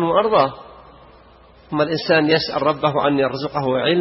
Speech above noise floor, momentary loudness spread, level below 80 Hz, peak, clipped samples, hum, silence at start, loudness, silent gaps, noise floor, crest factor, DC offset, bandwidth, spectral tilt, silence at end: 30 dB; 7 LU; -52 dBFS; -2 dBFS; under 0.1%; none; 0 s; -18 LUFS; none; -48 dBFS; 18 dB; under 0.1%; 6 kHz; -8.5 dB/octave; 0 s